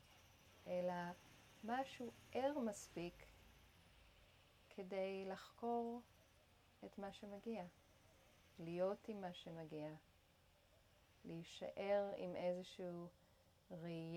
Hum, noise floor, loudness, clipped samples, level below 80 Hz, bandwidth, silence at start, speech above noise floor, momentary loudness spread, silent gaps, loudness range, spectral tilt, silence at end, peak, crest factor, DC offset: none; -74 dBFS; -48 LUFS; under 0.1%; -78 dBFS; 19 kHz; 0 s; 26 dB; 22 LU; none; 4 LU; -6 dB/octave; 0 s; -32 dBFS; 18 dB; under 0.1%